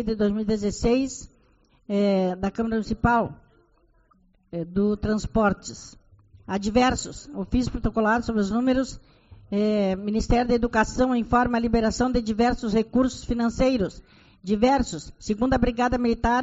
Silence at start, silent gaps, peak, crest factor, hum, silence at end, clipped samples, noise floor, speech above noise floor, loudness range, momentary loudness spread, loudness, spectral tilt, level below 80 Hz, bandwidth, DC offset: 0 s; none; -8 dBFS; 16 dB; none; 0 s; under 0.1%; -61 dBFS; 38 dB; 4 LU; 9 LU; -24 LUFS; -5.5 dB/octave; -38 dBFS; 8 kHz; under 0.1%